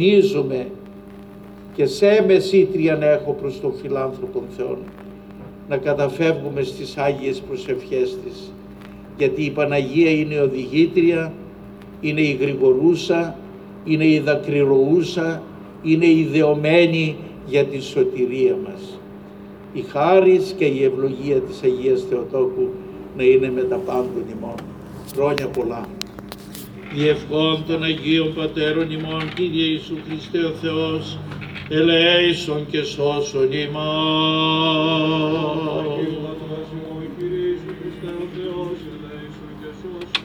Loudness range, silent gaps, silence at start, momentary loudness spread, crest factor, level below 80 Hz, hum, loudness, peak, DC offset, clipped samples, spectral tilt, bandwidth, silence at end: 6 LU; none; 0 s; 20 LU; 18 dB; -50 dBFS; none; -19 LUFS; -2 dBFS; under 0.1%; under 0.1%; -6 dB/octave; 15.5 kHz; 0 s